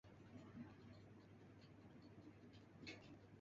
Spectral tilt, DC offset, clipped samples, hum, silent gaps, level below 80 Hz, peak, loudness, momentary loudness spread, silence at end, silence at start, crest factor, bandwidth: -5 dB/octave; under 0.1%; under 0.1%; none; none; -78 dBFS; -42 dBFS; -62 LUFS; 7 LU; 0 s; 0.05 s; 20 dB; 7.4 kHz